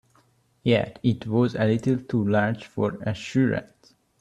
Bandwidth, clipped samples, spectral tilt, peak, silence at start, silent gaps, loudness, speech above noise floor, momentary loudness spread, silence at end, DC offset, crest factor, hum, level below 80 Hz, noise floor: 9.8 kHz; under 0.1%; -7.5 dB/octave; -8 dBFS; 0.65 s; none; -25 LUFS; 39 dB; 6 LU; 0.55 s; under 0.1%; 18 dB; none; -58 dBFS; -63 dBFS